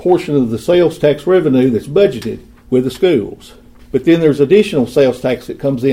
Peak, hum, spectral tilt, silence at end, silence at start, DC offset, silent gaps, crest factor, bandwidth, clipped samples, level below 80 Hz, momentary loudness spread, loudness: 0 dBFS; none; -7 dB/octave; 0 s; 0 s; under 0.1%; none; 14 dB; 15.5 kHz; under 0.1%; -44 dBFS; 8 LU; -13 LUFS